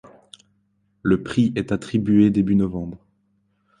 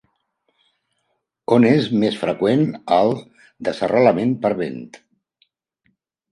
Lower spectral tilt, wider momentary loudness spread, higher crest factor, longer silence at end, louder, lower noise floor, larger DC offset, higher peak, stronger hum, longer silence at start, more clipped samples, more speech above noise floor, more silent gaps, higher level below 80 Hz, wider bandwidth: about the same, -8 dB/octave vs -7.5 dB/octave; about the same, 11 LU vs 13 LU; about the same, 18 dB vs 20 dB; second, 0.85 s vs 1.35 s; about the same, -20 LUFS vs -18 LUFS; second, -67 dBFS vs -72 dBFS; neither; second, -6 dBFS vs -2 dBFS; neither; second, 1.05 s vs 1.5 s; neither; second, 47 dB vs 55 dB; neither; first, -48 dBFS vs -62 dBFS; about the same, 10 kHz vs 11 kHz